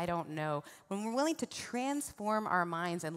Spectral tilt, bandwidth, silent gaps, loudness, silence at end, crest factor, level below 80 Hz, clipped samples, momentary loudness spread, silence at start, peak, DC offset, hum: -4.5 dB/octave; 16 kHz; none; -36 LUFS; 0 s; 18 dB; -70 dBFS; under 0.1%; 7 LU; 0 s; -18 dBFS; under 0.1%; none